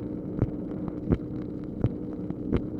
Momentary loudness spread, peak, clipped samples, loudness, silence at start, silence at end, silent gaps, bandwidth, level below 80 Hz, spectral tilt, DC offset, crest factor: 6 LU; -10 dBFS; under 0.1%; -32 LUFS; 0 s; 0 s; none; 4.9 kHz; -42 dBFS; -11 dB/octave; under 0.1%; 22 dB